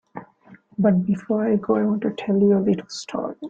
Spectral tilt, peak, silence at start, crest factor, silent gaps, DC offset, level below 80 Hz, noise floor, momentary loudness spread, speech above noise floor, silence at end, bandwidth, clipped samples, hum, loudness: -7.5 dB/octave; -6 dBFS; 0.15 s; 14 dB; none; under 0.1%; -62 dBFS; -50 dBFS; 13 LU; 30 dB; 0 s; 7.8 kHz; under 0.1%; none; -21 LUFS